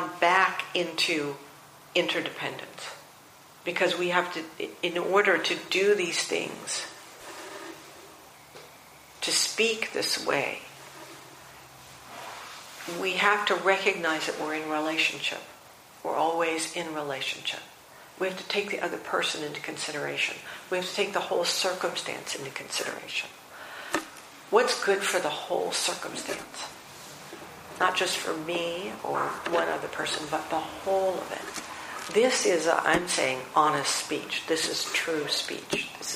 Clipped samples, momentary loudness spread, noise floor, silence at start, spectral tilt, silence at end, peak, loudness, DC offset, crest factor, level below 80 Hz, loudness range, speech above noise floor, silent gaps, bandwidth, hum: under 0.1%; 19 LU; -52 dBFS; 0 s; -2 dB/octave; 0 s; -8 dBFS; -27 LUFS; under 0.1%; 22 dB; -68 dBFS; 5 LU; 24 dB; none; 15.5 kHz; none